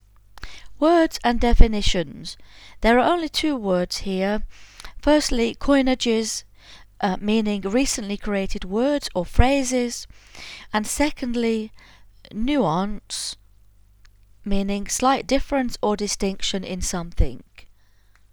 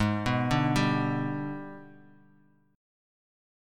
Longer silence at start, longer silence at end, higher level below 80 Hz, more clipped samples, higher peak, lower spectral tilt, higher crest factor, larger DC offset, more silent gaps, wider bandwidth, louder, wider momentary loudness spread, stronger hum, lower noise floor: first, 0.35 s vs 0 s; second, 0.65 s vs 1.8 s; first, -28 dBFS vs -50 dBFS; neither; first, 0 dBFS vs -12 dBFS; second, -4.5 dB/octave vs -6.5 dB/octave; about the same, 22 dB vs 18 dB; neither; neither; first, 19 kHz vs 14.5 kHz; first, -22 LUFS vs -28 LUFS; about the same, 18 LU vs 16 LU; neither; second, -54 dBFS vs -63 dBFS